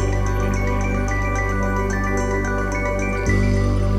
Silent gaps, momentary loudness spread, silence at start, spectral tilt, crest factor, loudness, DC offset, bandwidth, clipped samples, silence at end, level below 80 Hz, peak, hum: none; 3 LU; 0 s; -6.5 dB/octave; 12 dB; -21 LUFS; under 0.1%; 12 kHz; under 0.1%; 0 s; -24 dBFS; -6 dBFS; 50 Hz at -35 dBFS